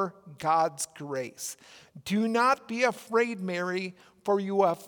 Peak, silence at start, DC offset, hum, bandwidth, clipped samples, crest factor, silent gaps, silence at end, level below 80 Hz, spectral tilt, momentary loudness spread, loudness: -10 dBFS; 0 s; under 0.1%; none; over 20 kHz; under 0.1%; 18 dB; none; 0 s; -76 dBFS; -4.5 dB/octave; 13 LU; -29 LUFS